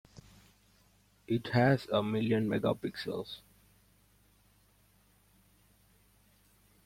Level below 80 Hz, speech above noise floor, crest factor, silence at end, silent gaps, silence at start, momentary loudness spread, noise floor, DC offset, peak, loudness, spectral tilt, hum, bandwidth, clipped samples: -66 dBFS; 36 dB; 22 dB; 3.5 s; none; 1.3 s; 12 LU; -67 dBFS; under 0.1%; -14 dBFS; -32 LUFS; -7.5 dB/octave; 50 Hz at -65 dBFS; 16.5 kHz; under 0.1%